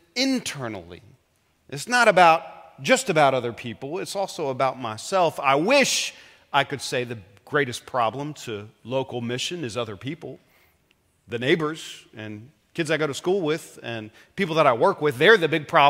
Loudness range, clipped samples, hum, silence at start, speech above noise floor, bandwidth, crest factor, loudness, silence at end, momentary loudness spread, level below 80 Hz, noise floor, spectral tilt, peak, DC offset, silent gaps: 8 LU; under 0.1%; none; 0.15 s; 43 dB; 16 kHz; 22 dB; -22 LUFS; 0 s; 18 LU; -68 dBFS; -66 dBFS; -4 dB/octave; 0 dBFS; under 0.1%; none